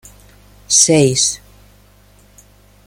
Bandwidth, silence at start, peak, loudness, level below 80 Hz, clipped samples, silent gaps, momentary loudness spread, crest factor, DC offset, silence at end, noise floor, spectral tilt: 16.5 kHz; 0.7 s; 0 dBFS; -12 LUFS; -48 dBFS; under 0.1%; none; 9 LU; 18 dB; under 0.1%; 1.5 s; -48 dBFS; -3 dB/octave